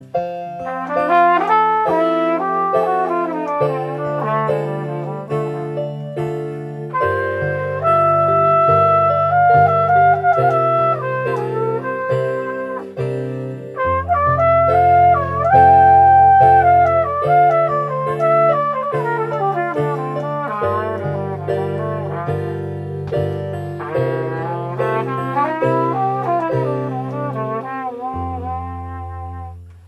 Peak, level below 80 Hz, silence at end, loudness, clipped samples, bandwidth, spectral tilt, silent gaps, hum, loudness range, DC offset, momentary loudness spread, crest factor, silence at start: 0 dBFS; -46 dBFS; 0.1 s; -17 LUFS; under 0.1%; 11.5 kHz; -8.5 dB/octave; none; none; 10 LU; under 0.1%; 13 LU; 16 dB; 0 s